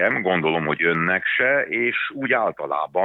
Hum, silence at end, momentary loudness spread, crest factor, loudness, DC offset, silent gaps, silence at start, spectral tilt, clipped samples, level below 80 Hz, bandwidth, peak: none; 0 s; 5 LU; 16 dB; -21 LUFS; under 0.1%; none; 0 s; -8 dB/octave; under 0.1%; -62 dBFS; 4.1 kHz; -6 dBFS